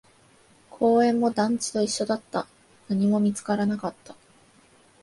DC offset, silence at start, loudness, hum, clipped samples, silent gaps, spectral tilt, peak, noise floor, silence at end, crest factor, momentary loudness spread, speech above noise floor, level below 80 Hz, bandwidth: under 0.1%; 0.75 s; -25 LUFS; none; under 0.1%; none; -5.5 dB/octave; -10 dBFS; -57 dBFS; 0.9 s; 16 dB; 12 LU; 34 dB; -68 dBFS; 11.5 kHz